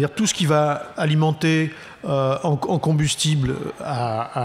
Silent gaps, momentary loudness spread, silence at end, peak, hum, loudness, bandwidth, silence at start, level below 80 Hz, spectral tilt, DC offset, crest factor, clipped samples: none; 7 LU; 0 s; -6 dBFS; none; -21 LUFS; 14 kHz; 0 s; -50 dBFS; -5 dB/octave; under 0.1%; 14 dB; under 0.1%